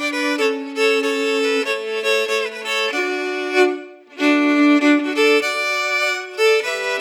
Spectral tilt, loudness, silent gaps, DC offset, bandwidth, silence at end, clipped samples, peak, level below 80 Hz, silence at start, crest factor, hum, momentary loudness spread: -1 dB/octave; -18 LUFS; none; under 0.1%; 16.5 kHz; 0 s; under 0.1%; -4 dBFS; under -90 dBFS; 0 s; 14 dB; none; 7 LU